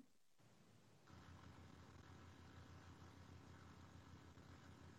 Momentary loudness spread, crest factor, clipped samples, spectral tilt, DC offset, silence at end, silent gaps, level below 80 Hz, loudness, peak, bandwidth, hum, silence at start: 1 LU; 12 dB; under 0.1%; -5.5 dB/octave; under 0.1%; 0 s; none; -76 dBFS; -64 LUFS; -50 dBFS; 13 kHz; none; 0 s